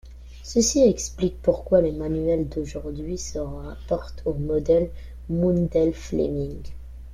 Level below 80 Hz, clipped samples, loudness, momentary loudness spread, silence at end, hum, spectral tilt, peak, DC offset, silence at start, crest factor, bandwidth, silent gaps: -38 dBFS; under 0.1%; -24 LUFS; 13 LU; 0 s; none; -6 dB/octave; -6 dBFS; under 0.1%; 0.05 s; 18 dB; 14 kHz; none